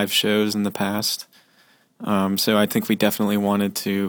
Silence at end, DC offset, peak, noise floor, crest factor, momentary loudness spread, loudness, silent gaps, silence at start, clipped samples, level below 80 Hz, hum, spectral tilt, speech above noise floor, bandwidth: 0 s; under 0.1%; -4 dBFS; -58 dBFS; 18 dB; 6 LU; -21 LUFS; none; 0 s; under 0.1%; -64 dBFS; none; -4 dB/octave; 37 dB; 20 kHz